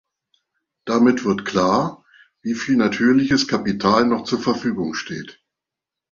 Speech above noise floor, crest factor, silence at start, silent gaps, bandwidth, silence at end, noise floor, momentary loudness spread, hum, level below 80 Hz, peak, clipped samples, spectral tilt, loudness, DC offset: 67 dB; 18 dB; 0.85 s; none; 7.4 kHz; 0.8 s; -86 dBFS; 13 LU; none; -54 dBFS; -2 dBFS; under 0.1%; -5 dB/octave; -19 LUFS; under 0.1%